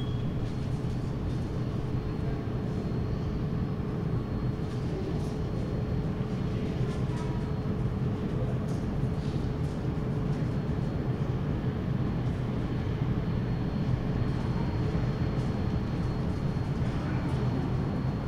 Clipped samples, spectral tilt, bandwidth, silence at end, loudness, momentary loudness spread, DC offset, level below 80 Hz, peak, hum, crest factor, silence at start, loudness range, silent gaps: under 0.1%; -8.5 dB/octave; 10 kHz; 0 s; -31 LUFS; 3 LU; under 0.1%; -40 dBFS; -16 dBFS; none; 14 dB; 0 s; 2 LU; none